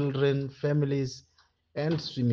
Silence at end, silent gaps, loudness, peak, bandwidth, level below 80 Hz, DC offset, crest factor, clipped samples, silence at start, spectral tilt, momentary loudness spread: 0 s; none; -29 LUFS; -14 dBFS; 7 kHz; -64 dBFS; under 0.1%; 14 dB; under 0.1%; 0 s; -7.5 dB/octave; 11 LU